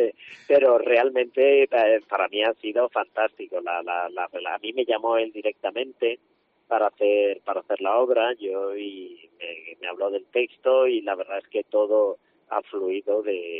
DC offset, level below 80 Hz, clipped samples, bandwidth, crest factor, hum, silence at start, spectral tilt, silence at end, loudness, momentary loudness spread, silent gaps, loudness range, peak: under 0.1%; -80 dBFS; under 0.1%; 4.7 kHz; 16 dB; none; 0 s; 0.5 dB/octave; 0 s; -24 LUFS; 13 LU; none; 6 LU; -8 dBFS